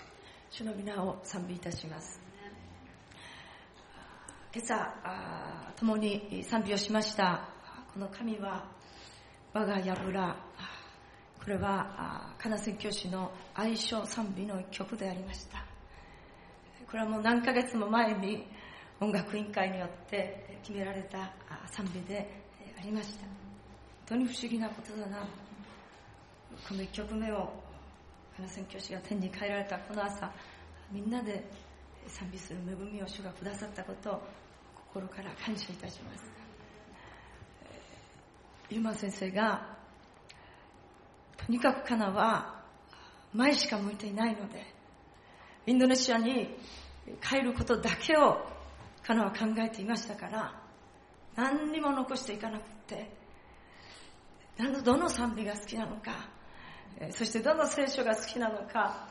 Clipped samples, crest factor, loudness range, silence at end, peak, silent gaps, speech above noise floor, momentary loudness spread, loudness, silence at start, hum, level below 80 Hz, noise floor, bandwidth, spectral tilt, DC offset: under 0.1%; 26 dB; 11 LU; 0 s; -10 dBFS; none; 24 dB; 24 LU; -34 LUFS; 0 s; none; -60 dBFS; -57 dBFS; 11.5 kHz; -4.5 dB/octave; under 0.1%